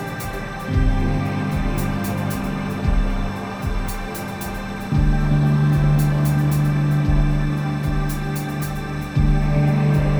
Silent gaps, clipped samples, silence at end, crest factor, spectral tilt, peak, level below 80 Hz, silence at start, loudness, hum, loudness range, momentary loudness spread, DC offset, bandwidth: none; under 0.1%; 0 s; 14 dB; -7 dB/octave; -6 dBFS; -24 dBFS; 0 s; -21 LUFS; none; 5 LU; 10 LU; under 0.1%; over 20 kHz